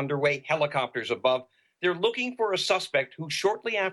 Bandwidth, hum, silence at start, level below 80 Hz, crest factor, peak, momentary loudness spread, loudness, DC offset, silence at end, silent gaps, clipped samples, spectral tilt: 12.5 kHz; none; 0 s; -72 dBFS; 16 dB; -10 dBFS; 4 LU; -27 LUFS; under 0.1%; 0 s; none; under 0.1%; -4 dB/octave